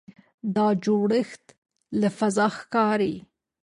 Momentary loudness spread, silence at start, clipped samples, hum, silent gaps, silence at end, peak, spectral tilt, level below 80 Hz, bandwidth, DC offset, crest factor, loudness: 10 LU; 0.45 s; under 0.1%; none; 1.58-1.62 s; 0.4 s; -10 dBFS; -6 dB/octave; -66 dBFS; 11 kHz; under 0.1%; 16 dB; -24 LUFS